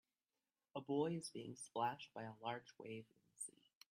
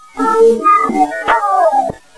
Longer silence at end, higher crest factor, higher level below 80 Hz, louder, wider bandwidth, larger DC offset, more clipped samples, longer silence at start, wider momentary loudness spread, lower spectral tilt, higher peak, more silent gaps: first, 0.4 s vs 0.2 s; first, 20 dB vs 12 dB; second, -90 dBFS vs -48 dBFS; second, -47 LUFS vs -12 LUFS; first, 15 kHz vs 11 kHz; neither; neither; first, 0.75 s vs 0.15 s; first, 12 LU vs 5 LU; about the same, -4.5 dB/octave vs -5 dB/octave; second, -28 dBFS vs 0 dBFS; neither